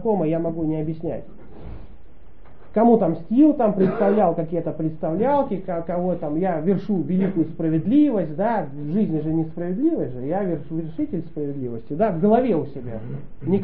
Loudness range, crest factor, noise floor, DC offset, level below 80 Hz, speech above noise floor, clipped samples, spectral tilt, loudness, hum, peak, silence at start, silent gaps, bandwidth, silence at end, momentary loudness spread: 4 LU; 18 dB; -47 dBFS; 2%; -48 dBFS; 26 dB; under 0.1%; -9 dB/octave; -22 LUFS; none; -4 dBFS; 0 s; none; 4.4 kHz; 0 s; 13 LU